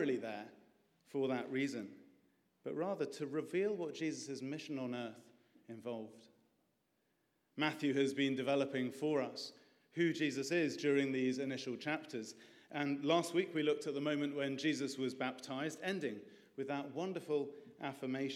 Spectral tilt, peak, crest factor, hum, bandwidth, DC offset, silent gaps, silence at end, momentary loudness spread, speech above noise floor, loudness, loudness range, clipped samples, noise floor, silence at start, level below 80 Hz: -5 dB/octave; -20 dBFS; 20 dB; none; 14.5 kHz; under 0.1%; none; 0 s; 13 LU; 42 dB; -39 LUFS; 6 LU; under 0.1%; -81 dBFS; 0 s; under -90 dBFS